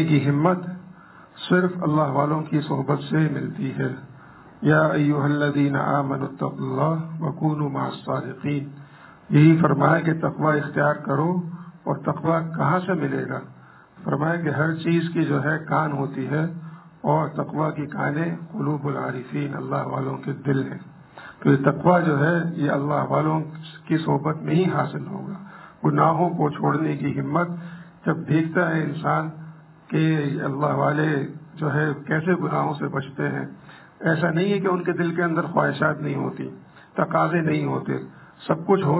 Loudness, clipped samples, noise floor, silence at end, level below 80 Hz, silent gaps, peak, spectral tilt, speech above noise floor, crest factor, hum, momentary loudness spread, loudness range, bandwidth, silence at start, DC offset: -23 LUFS; under 0.1%; -47 dBFS; 0 s; -62 dBFS; none; -4 dBFS; -12 dB/octave; 25 dB; 20 dB; none; 12 LU; 4 LU; 4 kHz; 0 s; under 0.1%